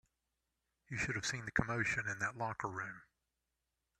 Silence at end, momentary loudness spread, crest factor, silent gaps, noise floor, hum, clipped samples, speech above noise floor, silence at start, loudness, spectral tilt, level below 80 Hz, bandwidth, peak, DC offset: 0.95 s; 10 LU; 24 dB; none; -88 dBFS; none; under 0.1%; 48 dB; 0.9 s; -39 LUFS; -4 dB/octave; -64 dBFS; 13 kHz; -18 dBFS; under 0.1%